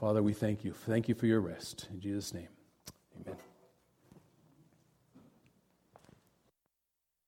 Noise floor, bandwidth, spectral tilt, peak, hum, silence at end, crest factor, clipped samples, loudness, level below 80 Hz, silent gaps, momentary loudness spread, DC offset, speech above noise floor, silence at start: -86 dBFS; 16.5 kHz; -6.5 dB/octave; -18 dBFS; none; 2.1 s; 20 dB; under 0.1%; -35 LUFS; -68 dBFS; none; 23 LU; under 0.1%; 52 dB; 0 s